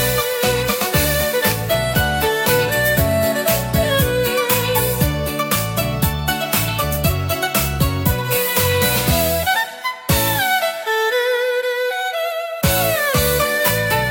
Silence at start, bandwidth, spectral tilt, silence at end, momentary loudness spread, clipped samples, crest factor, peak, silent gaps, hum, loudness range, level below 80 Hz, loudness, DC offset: 0 s; 17 kHz; -3.5 dB/octave; 0 s; 4 LU; under 0.1%; 16 dB; -2 dBFS; none; none; 2 LU; -32 dBFS; -17 LUFS; under 0.1%